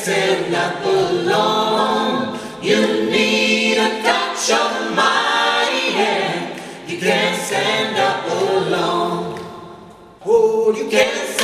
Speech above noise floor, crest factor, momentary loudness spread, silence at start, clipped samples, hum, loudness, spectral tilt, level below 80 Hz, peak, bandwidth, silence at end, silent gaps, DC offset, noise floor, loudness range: 24 dB; 16 dB; 10 LU; 0 s; under 0.1%; none; -17 LUFS; -3 dB/octave; -60 dBFS; 0 dBFS; 14 kHz; 0 s; none; under 0.1%; -40 dBFS; 3 LU